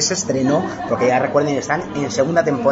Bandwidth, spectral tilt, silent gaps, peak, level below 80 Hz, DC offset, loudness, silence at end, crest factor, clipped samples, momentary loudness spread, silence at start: 8 kHz; -4.5 dB/octave; none; -2 dBFS; -52 dBFS; under 0.1%; -18 LUFS; 0 s; 16 dB; under 0.1%; 5 LU; 0 s